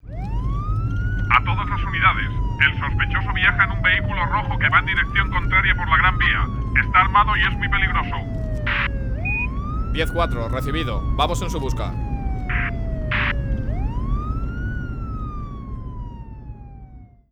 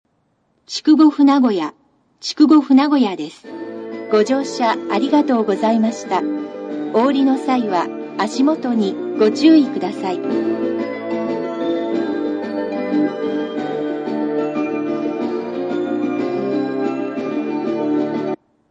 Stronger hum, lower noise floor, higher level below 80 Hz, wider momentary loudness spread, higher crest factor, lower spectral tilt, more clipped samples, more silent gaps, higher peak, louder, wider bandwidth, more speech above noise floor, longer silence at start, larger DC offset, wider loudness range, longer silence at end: neither; second, -42 dBFS vs -64 dBFS; first, -26 dBFS vs -70 dBFS; about the same, 13 LU vs 11 LU; about the same, 20 dB vs 18 dB; about the same, -5.5 dB/octave vs -5.5 dB/octave; neither; neither; about the same, 0 dBFS vs 0 dBFS; second, -21 LUFS vs -18 LUFS; first, 12.5 kHz vs 9.4 kHz; second, 23 dB vs 48 dB; second, 0.05 s vs 0.7 s; neither; about the same, 8 LU vs 6 LU; about the same, 0.25 s vs 0.35 s